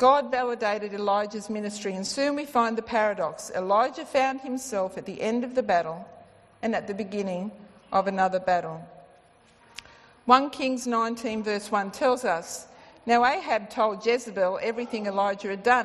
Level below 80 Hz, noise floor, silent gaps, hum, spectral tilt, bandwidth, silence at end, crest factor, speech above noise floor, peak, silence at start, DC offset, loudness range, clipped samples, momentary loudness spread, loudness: -66 dBFS; -58 dBFS; none; none; -4 dB/octave; 12.5 kHz; 0 s; 22 dB; 32 dB; -4 dBFS; 0 s; under 0.1%; 3 LU; under 0.1%; 11 LU; -26 LUFS